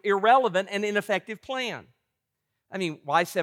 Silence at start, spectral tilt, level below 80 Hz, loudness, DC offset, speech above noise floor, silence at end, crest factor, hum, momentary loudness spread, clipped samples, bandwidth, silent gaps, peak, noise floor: 0.05 s; -4 dB/octave; -78 dBFS; -26 LUFS; under 0.1%; 56 dB; 0 s; 20 dB; none; 13 LU; under 0.1%; 16.5 kHz; none; -6 dBFS; -82 dBFS